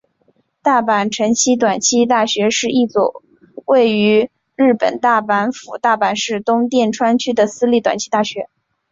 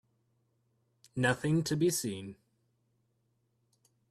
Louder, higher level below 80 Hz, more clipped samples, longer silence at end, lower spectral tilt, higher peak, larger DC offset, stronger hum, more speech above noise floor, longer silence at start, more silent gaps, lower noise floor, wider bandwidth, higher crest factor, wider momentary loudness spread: first, -15 LUFS vs -31 LUFS; first, -60 dBFS vs -68 dBFS; neither; second, 0.45 s vs 1.75 s; second, -3.5 dB/octave vs -5 dB/octave; first, -2 dBFS vs -14 dBFS; neither; neither; about the same, 45 dB vs 46 dB; second, 0.65 s vs 1.15 s; neither; second, -60 dBFS vs -77 dBFS; second, 7.8 kHz vs 14.5 kHz; second, 14 dB vs 22 dB; second, 6 LU vs 15 LU